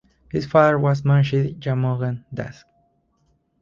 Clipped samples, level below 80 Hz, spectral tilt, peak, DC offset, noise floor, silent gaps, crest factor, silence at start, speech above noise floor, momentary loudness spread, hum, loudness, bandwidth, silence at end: under 0.1%; -52 dBFS; -8.5 dB/octave; 0 dBFS; under 0.1%; -65 dBFS; none; 20 dB; 0.35 s; 46 dB; 15 LU; none; -20 LUFS; 7 kHz; 1.1 s